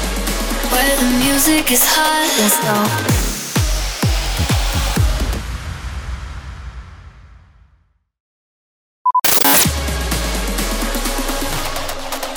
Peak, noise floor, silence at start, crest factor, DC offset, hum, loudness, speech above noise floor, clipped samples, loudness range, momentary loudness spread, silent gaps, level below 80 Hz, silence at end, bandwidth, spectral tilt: 0 dBFS; -57 dBFS; 0 s; 16 dB; under 0.1%; none; -15 LUFS; 43 dB; under 0.1%; 15 LU; 16 LU; 8.20-9.05 s; -24 dBFS; 0 s; over 20 kHz; -3 dB/octave